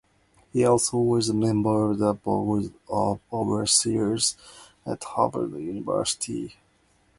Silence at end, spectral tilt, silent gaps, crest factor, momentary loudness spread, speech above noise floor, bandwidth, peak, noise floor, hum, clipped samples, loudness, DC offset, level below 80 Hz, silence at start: 0.65 s; -4.5 dB/octave; none; 18 dB; 12 LU; 39 dB; 11.5 kHz; -6 dBFS; -64 dBFS; none; under 0.1%; -24 LUFS; under 0.1%; -56 dBFS; 0.55 s